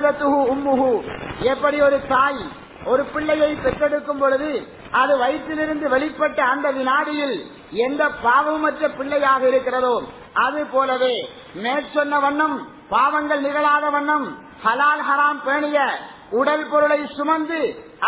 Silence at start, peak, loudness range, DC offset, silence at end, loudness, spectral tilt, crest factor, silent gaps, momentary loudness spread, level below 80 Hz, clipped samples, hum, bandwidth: 0 s; -4 dBFS; 1 LU; under 0.1%; 0 s; -20 LUFS; -8 dB/octave; 16 dB; none; 8 LU; -52 dBFS; under 0.1%; none; 4 kHz